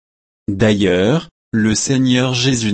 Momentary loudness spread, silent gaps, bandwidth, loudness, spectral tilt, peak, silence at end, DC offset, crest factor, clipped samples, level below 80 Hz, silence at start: 8 LU; 1.31-1.52 s; 8.8 kHz; -15 LUFS; -5 dB/octave; -2 dBFS; 0 s; under 0.1%; 14 dB; under 0.1%; -44 dBFS; 0.5 s